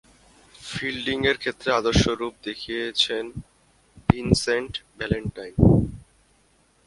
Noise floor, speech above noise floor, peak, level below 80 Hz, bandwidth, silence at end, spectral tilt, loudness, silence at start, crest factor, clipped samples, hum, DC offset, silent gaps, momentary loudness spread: -62 dBFS; 38 dB; 0 dBFS; -38 dBFS; 11.5 kHz; 0.85 s; -5.5 dB/octave; -24 LUFS; 0.6 s; 24 dB; under 0.1%; none; under 0.1%; none; 14 LU